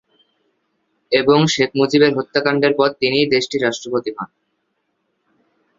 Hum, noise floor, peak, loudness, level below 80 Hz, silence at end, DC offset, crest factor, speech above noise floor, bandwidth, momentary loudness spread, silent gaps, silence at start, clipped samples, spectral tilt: none; -70 dBFS; 0 dBFS; -16 LUFS; -58 dBFS; 1.55 s; under 0.1%; 18 dB; 54 dB; 7.8 kHz; 9 LU; none; 1.1 s; under 0.1%; -5 dB/octave